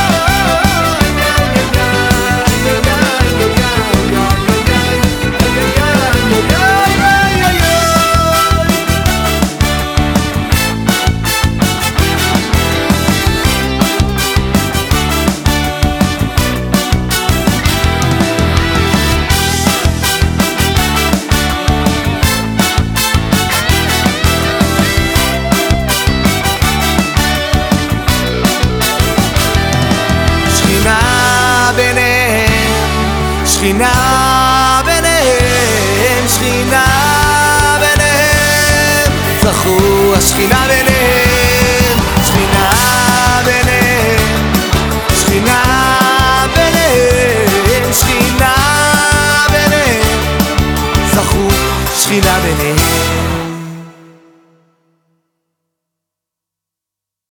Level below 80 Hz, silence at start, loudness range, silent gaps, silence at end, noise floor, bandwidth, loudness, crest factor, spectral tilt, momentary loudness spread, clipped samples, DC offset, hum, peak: -20 dBFS; 0 s; 3 LU; none; 3.4 s; -83 dBFS; over 20 kHz; -10 LUFS; 10 dB; -4 dB/octave; 4 LU; under 0.1%; under 0.1%; none; 0 dBFS